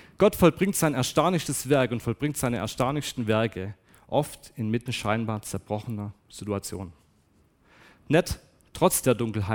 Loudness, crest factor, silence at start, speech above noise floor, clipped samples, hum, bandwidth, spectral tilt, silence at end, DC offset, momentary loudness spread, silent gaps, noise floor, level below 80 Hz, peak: -26 LUFS; 22 dB; 0.2 s; 37 dB; under 0.1%; none; 18 kHz; -5 dB/octave; 0 s; under 0.1%; 15 LU; none; -63 dBFS; -50 dBFS; -6 dBFS